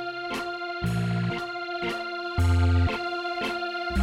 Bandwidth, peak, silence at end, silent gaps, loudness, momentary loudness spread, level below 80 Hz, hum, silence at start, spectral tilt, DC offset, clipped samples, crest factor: 12.5 kHz; -14 dBFS; 0 s; none; -28 LUFS; 8 LU; -38 dBFS; none; 0 s; -6.5 dB/octave; under 0.1%; under 0.1%; 12 dB